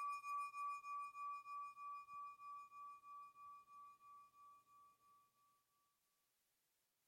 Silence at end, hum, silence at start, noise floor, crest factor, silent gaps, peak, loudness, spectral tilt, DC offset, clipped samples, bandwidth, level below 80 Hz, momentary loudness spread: 1.8 s; none; 0 s; -87 dBFS; 14 dB; none; -40 dBFS; -52 LUFS; 0 dB/octave; under 0.1%; under 0.1%; 16.5 kHz; under -90 dBFS; 18 LU